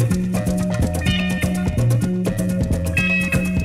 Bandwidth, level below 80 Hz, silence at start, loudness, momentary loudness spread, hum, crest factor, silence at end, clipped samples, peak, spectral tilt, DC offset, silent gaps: 15.5 kHz; -30 dBFS; 0 s; -20 LUFS; 4 LU; none; 12 dB; 0 s; under 0.1%; -6 dBFS; -6 dB/octave; under 0.1%; none